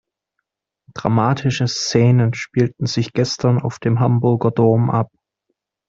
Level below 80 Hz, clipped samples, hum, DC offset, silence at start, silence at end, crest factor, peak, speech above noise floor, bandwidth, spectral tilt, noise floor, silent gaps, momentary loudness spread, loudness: -52 dBFS; under 0.1%; none; under 0.1%; 0.95 s; 0.85 s; 18 dB; 0 dBFS; 60 dB; 7.6 kHz; -6.5 dB/octave; -77 dBFS; none; 6 LU; -18 LUFS